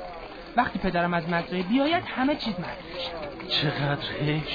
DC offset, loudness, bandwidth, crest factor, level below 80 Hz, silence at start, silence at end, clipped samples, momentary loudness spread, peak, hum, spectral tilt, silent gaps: under 0.1%; -27 LUFS; 5 kHz; 20 dB; -48 dBFS; 0 s; 0 s; under 0.1%; 10 LU; -8 dBFS; none; -7.5 dB/octave; none